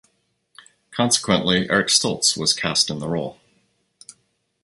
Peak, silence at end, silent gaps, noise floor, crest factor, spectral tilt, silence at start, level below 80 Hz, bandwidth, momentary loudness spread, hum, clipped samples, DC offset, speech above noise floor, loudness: -2 dBFS; 1.3 s; none; -68 dBFS; 22 dB; -2.5 dB/octave; 0.9 s; -54 dBFS; 12 kHz; 10 LU; none; under 0.1%; under 0.1%; 47 dB; -19 LUFS